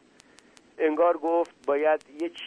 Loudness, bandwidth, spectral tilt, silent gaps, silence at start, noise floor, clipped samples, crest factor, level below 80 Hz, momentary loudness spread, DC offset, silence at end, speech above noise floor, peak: -26 LUFS; 10 kHz; -4.5 dB/octave; none; 0.8 s; -57 dBFS; under 0.1%; 16 dB; -74 dBFS; 6 LU; under 0.1%; 0 s; 31 dB; -12 dBFS